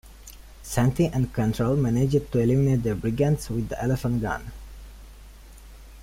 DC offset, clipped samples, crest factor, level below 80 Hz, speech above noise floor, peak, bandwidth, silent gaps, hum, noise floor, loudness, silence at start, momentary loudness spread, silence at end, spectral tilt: under 0.1%; under 0.1%; 16 dB; -42 dBFS; 22 dB; -10 dBFS; 16 kHz; none; none; -45 dBFS; -24 LUFS; 0.05 s; 22 LU; 0 s; -7.5 dB/octave